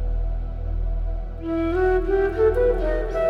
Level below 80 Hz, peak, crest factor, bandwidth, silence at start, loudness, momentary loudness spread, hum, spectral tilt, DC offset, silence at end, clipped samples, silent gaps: -26 dBFS; -10 dBFS; 12 dB; 5 kHz; 0 s; -23 LUFS; 11 LU; none; -9 dB/octave; under 0.1%; 0 s; under 0.1%; none